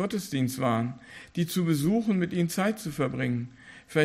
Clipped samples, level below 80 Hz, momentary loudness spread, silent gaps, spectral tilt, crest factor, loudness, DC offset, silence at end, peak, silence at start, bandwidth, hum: under 0.1%; -60 dBFS; 9 LU; none; -6 dB/octave; 18 dB; -28 LUFS; under 0.1%; 0 s; -10 dBFS; 0 s; 15.5 kHz; none